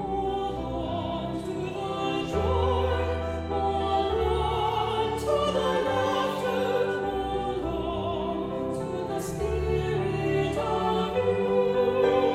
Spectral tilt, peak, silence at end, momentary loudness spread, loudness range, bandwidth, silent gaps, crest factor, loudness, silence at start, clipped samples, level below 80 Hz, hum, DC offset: -6 dB/octave; -12 dBFS; 0 s; 6 LU; 3 LU; 15 kHz; none; 16 dB; -27 LUFS; 0 s; under 0.1%; -40 dBFS; none; under 0.1%